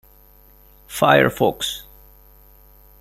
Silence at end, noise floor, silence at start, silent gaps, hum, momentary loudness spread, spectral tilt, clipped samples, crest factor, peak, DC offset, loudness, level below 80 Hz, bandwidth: 1.2 s; -50 dBFS; 0.9 s; none; none; 17 LU; -4.5 dB/octave; under 0.1%; 22 dB; -2 dBFS; under 0.1%; -18 LUFS; -50 dBFS; 16 kHz